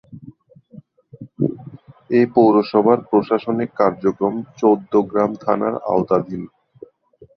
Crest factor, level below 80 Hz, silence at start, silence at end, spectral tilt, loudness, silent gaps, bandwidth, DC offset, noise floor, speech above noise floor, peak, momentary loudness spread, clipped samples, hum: 18 dB; -58 dBFS; 0.1 s; 0.9 s; -9 dB/octave; -18 LUFS; none; 6.4 kHz; under 0.1%; -50 dBFS; 33 dB; -2 dBFS; 10 LU; under 0.1%; none